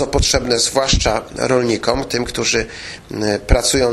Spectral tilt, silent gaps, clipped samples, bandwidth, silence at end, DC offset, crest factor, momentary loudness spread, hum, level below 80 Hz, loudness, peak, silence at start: -3.5 dB/octave; none; under 0.1%; 15 kHz; 0 s; under 0.1%; 16 dB; 7 LU; none; -26 dBFS; -17 LUFS; 0 dBFS; 0 s